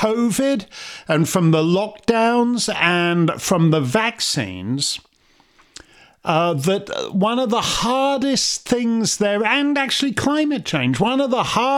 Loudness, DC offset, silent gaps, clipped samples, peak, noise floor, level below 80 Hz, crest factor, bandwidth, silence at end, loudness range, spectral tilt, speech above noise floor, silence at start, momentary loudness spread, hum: -19 LUFS; under 0.1%; none; under 0.1%; 0 dBFS; -56 dBFS; -52 dBFS; 18 dB; 16.5 kHz; 0 s; 4 LU; -4.5 dB/octave; 38 dB; 0 s; 5 LU; none